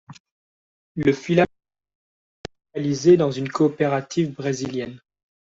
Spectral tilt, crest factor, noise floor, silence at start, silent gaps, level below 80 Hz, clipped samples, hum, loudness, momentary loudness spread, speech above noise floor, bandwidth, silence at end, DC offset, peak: -6.5 dB/octave; 20 dB; under -90 dBFS; 0.1 s; 0.20-0.25 s, 0.31-0.95 s, 1.95-2.44 s; -58 dBFS; under 0.1%; none; -21 LUFS; 19 LU; over 70 dB; 7.8 kHz; 0.65 s; under 0.1%; -4 dBFS